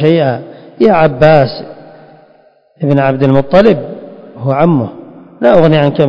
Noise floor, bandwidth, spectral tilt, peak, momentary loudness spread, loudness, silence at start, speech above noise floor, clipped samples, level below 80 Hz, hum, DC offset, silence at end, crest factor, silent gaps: -47 dBFS; 7 kHz; -9 dB/octave; 0 dBFS; 15 LU; -10 LUFS; 0 s; 38 dB; 1%; -42 dBFS; none; under 0.1%; 0 s; 10 dB; none